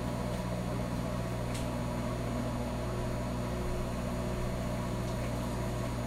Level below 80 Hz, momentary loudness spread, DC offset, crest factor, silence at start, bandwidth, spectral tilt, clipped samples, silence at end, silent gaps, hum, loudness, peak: -42 dBFS; 1 LU; under 0.1%; 12 dB; 0 s; 15.5 kHz; -6.5 dB/octave; under 0.1%; 0 s; none; 60 Hz at -35 dBFS; -35 LUFS; -22 dBFS